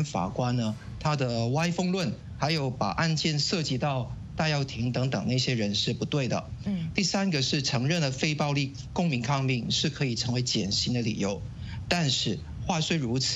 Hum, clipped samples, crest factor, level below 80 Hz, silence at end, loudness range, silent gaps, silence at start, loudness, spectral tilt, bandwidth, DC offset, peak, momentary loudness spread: none; under 0.1%; 20 dB; -50 dBFS; 0 s; 1 LU; none; 0 s; -28 LUFS; -4.5 dB/octave; 8.6 kHz; under 0.1%; -8 dBFS; 6 LU